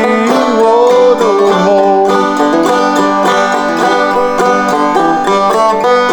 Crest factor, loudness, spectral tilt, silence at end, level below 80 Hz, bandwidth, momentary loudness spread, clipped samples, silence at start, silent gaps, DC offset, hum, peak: 10 dB; -9 LUFS; -4.5 dB/octave; 0 s; -46 dBFS; 20 kHz; 3 LU; under 0.1%; 0 s; none; under 0.1%; none; 0 dBFS